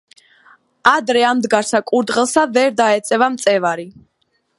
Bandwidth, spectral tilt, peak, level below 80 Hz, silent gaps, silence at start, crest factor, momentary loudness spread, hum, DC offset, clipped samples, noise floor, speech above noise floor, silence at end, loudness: 11.5 kHz; -3 dB/octave; 0 dBFS; -62 dBFS; none; 0.85 s; 16 dB; 3 LU; none; under 0.1%; under 0.1%; -66 dBFS; 51 dB; 0.7 s; -15 LUFS